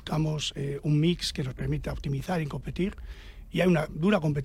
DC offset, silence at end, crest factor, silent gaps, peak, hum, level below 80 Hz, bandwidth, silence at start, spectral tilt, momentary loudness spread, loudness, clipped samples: under 0.1%; 0 s; 16 dB; none; -12 dBFS; none; -44 dBFS; 15 kHz; 0 s; -6 dB/octave; 9 LU; -29 LUFS; under 0.1%